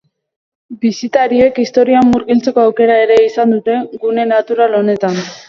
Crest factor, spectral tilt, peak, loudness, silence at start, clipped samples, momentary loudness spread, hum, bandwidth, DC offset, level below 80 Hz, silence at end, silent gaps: 12 dB; -6 dB/octave; 0 dBFS; -12 LUFS; 0.7 s; under 0.1%; 8 LU; none; 7.4 kHz; under 0.1%; -50 dBFS; 0.1 s; none